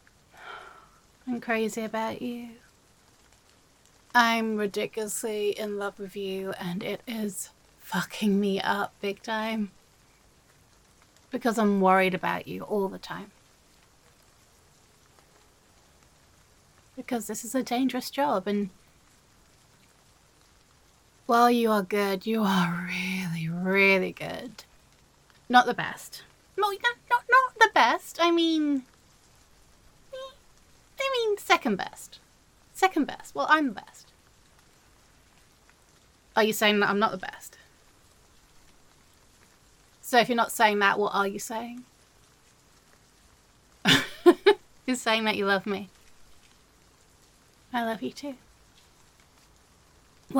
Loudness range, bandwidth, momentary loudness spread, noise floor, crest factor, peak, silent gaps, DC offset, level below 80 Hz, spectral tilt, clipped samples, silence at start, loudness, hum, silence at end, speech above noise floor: 10 LU; 17.5 kHz; 20 LU; -60 dBFS; 24 dB; -4 dBFS; none; under 0.1%; -66 dBFS; -4 dB/octave; under 0.1%; 0.4 s; -26 LUFS; none; 0 s; 34 dB